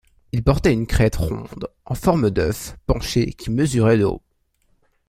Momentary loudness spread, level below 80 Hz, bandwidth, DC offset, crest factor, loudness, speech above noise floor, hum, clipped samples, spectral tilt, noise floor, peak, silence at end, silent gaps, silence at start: 12 LU; -32 dBFS; 16 kHz; under 0.1%; 18 dB; -20 LUFS; 44 dB; none; under 0.1%; -6.5 dB/octave; -64 dBFS; -2 dBFS; 0.9 s; none; 0.35 s